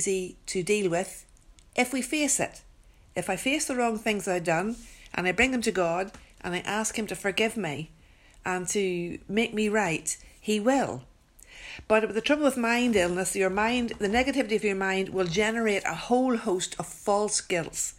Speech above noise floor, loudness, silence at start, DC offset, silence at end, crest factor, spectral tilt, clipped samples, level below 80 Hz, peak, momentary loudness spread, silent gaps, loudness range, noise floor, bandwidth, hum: 28 dB; -27 LUFS; 0 s; under 0.1%; 0.05 s; 20 dB; -3.5 dB/octave; under 0.1%; -54 dBFS; -8 dBFS; 10 LU; none; 4 LU; -55 dBFS; 16 kHz; none